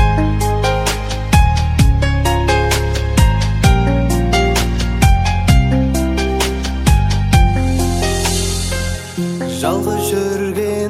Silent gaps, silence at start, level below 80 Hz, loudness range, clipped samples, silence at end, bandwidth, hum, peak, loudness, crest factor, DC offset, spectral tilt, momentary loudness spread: none; 0 s; -18 dBFS; 2 LU; under 0.1%; 0 s; 16 kHz; none; 0 dBFS; -15 LUFS; 14 dB; under 0.1%; -5 dB/octave; 5 LU